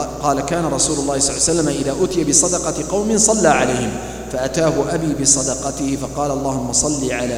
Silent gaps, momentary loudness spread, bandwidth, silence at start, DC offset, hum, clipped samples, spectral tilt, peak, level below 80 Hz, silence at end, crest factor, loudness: none; 8 LU; 16.5 kHz; 0 s; under 0.1%; none; under 0.1%; -3.5 dB/octave; 0 dBFS; -36 dBFS; 0 s; 18 dB; -17 LUFS